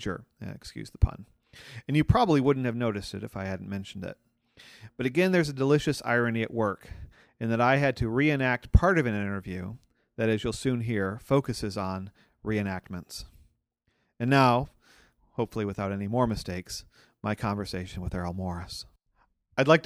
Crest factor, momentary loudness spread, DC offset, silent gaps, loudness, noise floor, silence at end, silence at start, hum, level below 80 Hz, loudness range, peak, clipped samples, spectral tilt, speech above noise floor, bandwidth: 24 dB; 18 LU; under 0.1%; none; -28 LUFS; -75 dBFS; 0.05 s; 0 s; none; -42 dBFS; 6 LU; -6 dBFS; under 0.1%; -6.5 dB/octave; 47 dB; 15 kHz